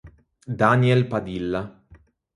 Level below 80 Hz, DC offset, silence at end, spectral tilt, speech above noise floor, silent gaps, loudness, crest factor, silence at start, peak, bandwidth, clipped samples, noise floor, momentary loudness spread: -52 dBFS; under 0.1%; 0.65 s; -8 dB/octave; 33 dB; none; -21 LUFS; 22 dB; 0.05 s; -2 dBFS; 11 kHz; under 0.1%; -53 dBFS; 15 LU